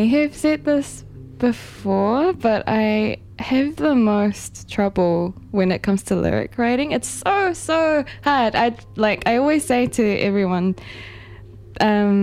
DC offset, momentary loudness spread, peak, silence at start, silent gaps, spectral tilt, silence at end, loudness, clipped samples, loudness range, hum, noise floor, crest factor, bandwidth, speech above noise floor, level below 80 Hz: under 0.1%; 10 LU; -4 dBFS; 0 s; none; -5.5 dB/octave; 0 s; -20 LUFS; under 0.1%; 2 LU; none; -40 dBFS; 16 dB; 14.5 kHz; 21 dB; -46 dBFS